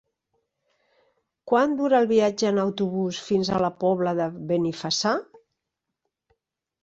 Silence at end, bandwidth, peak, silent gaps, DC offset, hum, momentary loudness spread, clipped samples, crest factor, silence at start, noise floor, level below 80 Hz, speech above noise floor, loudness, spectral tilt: 1.6 s; 8 kHz; -8 dBFS; none; under 0.1%; none; 5 LU; under 0.1%; 18 dB; 1.45 s; -83 dBFS; -64 dBFS; 60 dB; -24 LUFS; -5 dB/octave